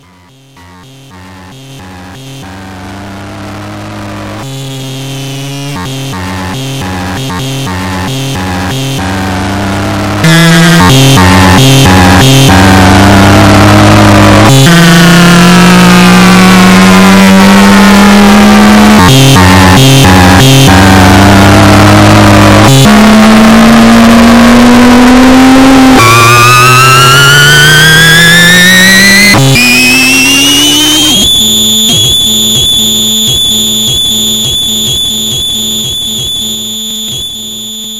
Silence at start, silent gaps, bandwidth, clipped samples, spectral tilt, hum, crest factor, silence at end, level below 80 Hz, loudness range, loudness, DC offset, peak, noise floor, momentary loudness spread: 0.05 s; none; over 20 kHz; 8%; -4 dB/octave; none; 4 dB; 0 s; -22 dBFS; 15 LU; -2 LUFS; 2%; 0 dBFS; -38 dBFS; 15 LU